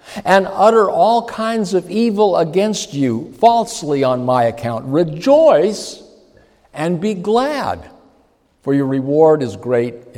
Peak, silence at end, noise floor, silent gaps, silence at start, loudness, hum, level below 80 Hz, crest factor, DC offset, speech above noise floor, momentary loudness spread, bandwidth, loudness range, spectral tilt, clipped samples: 0 dBFS; 0.15 s; -56 dBFS; none; 0.05 s; -15 LUFS; none; -54 dBFS; 16 dB; under 0.1%; 41 dB; 10 LU; 15.5 kHz; 5 LU; -5.5 dB/octave; under 0.1%